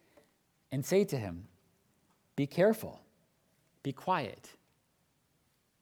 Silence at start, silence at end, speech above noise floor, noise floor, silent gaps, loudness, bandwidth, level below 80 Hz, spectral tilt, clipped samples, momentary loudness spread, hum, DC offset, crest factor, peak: 0.7 s; 1.3 s; 42 dB; -75 dBFS; none; -33 LUFS; 20 kHz; -72 dBFS; -6 dB/octave; under 0.1%; 16 LU; none; under 0.1%; 22 dB; -14 dBFS